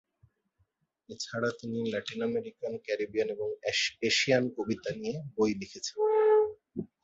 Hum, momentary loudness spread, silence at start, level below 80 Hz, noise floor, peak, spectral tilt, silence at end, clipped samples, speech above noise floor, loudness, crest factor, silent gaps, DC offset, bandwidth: none; 13 LU; 1.1 s; -68 dBFS; -75 dBFS; -12 dBFS; -4 dB/octave; 0.2 s; under 0.1%; 44 dB; -30 LUFS; 20 dB; none; under 0.1%; 8 kHz